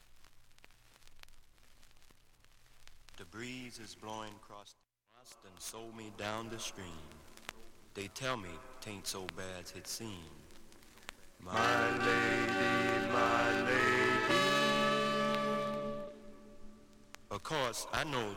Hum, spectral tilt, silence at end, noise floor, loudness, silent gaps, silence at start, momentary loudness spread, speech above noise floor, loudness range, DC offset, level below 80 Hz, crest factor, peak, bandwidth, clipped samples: none; -3.5 dB/octave; 0 s; -62 dBFS; -34 LUFS; none; 0.15 s; 23 LU; 23 dB; 19 LU; under 0.1%; -60 dBFS; 22 dB; -16 dBFS; 17 kHz; under 0.1%